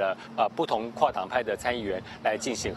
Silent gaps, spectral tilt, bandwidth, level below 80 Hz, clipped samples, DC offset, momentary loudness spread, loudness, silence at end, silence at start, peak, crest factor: none; -3.5 dB/octave; 13 kHz; -56 dBFS; under 0.1%; under 0.1%; 4 LU; -29 LUFS; 0 s; 0 s; -8 dBFS; 22 dB